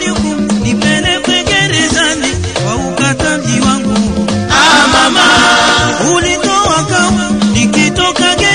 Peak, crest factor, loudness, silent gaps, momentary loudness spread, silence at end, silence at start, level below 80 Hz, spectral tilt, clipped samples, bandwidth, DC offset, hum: 0 dBFS; 10 dB; -9 LUFS; none; 8 LU; 0 s; 0 s; -30 dBFS; -3 dB/octave; 0.1%; 11 kHz; 0.7%; none